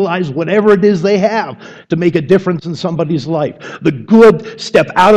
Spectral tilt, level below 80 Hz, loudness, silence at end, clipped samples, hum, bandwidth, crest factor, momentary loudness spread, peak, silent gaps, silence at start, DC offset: -7 dB/octave; -48 dBFS; -12 LUFS; 0 s; under 0.1%; none; 10.5 kHz; 12 dB; 12 LU; 0 dBFS; none; 0 s; under 0.1%